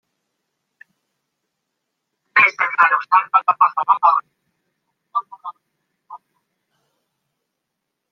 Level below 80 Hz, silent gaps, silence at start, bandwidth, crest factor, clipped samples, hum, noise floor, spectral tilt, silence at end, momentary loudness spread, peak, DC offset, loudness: -82 dBFS; none; 2.35 s; 6.8 kHz; 20 dB; under 0.1%; none; -78 dBFS; -2.5 dB/octave; 1.95 s; 14 LU; 0 dBFS; under 0.1%; -16 LUFS